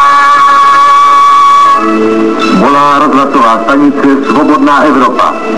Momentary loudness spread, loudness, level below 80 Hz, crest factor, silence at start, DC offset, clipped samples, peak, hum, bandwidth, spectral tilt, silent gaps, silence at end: 5 LU; -5 LUFS; -44 dBFS; 6 dB; 0 s; 6%; 0.7%; 0 dBFS; none; 12 kHz; -5 dB/octave; none; 0 s